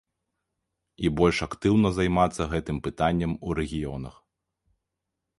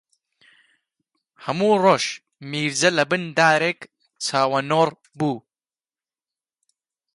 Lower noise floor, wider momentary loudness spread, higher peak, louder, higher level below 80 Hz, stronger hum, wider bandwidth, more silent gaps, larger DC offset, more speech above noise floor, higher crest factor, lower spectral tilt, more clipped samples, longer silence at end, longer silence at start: second, -84 dBFS vs under -90 dBFS; second, 10 LU vs 13 LU; about the same, -6 dBFS vs -4 dBFS; second, -26 LUFS vs -20 LUFS; first, -42 dBFS vs -70 dBFS; neither; about the same, 11.5 kHz vs 11.5 kHz; neither; neither; second, 59 dB vs over 70 dB; about the same, 22 dB vs 20 dB; first, -6.5 dB/octave vs -4 dB/octave; neither; second, 1.3 s vs 1.75 s; second, 1 s vs 1.4 s